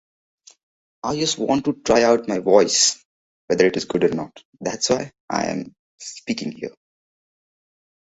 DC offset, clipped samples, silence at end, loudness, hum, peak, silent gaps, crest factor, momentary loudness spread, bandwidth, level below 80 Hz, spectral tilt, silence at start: under 0.1%; under 0.1%; 1.4 s; -20 LUFS; none; -2 dBFS; 3.05-3.48 s, 4.45-4.53 s, 5.20-5.28 s, 5.79-5.98 s; 20 dB; 18 LU; 8.2 kHz; -58 dBFS; -3 dB/octave; 1.05 s